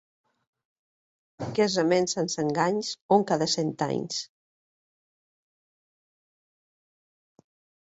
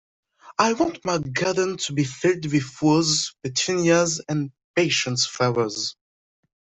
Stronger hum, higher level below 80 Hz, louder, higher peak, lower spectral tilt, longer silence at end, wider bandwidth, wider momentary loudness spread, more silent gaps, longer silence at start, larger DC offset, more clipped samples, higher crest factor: neither; second, -70 dBFS vs -60 dBFS; second, -26 LUFS vs -22 LUFS; second, -8 dBFS vs -4 dBFS; about the same, -4.5 dB/octave vs -4 dB/octave; first, 3.6 s vs 0.7 s; about the same, 8 kHz vs 8.4 kHz; first, 10 LU vs 7 LU; about the same, 3.01-3.09 s vs 4.64-4.74 s; first, 1.4 s vs 0.45 s; neither; neither; about the same, 22 dB vs 20 dB